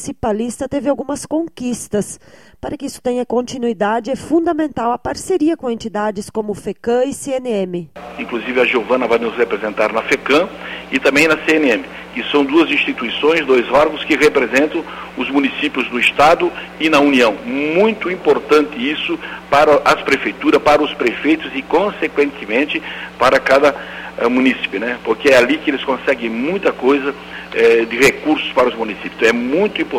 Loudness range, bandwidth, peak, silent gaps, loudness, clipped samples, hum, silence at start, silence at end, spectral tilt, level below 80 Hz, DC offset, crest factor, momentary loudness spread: 5 LU; 16 kHz; 0 dBFS; none; -16 LUFS; under 0.1%; none; 0 s; 0 s; -4 dB/octave; -48 dBFS; under 0.1%; 16 dB; 11 LU